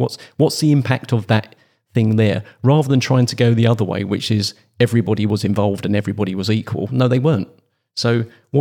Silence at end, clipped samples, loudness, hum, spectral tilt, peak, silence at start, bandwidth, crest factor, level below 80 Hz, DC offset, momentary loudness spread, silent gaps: 0 s; under 0.1%; -18 LUFS; none; -6.5 dB/octave; -2 dBFS; 0 s; 15 kHz; 16 dB; -64 dBFS; under 0.1%; 7 LU; none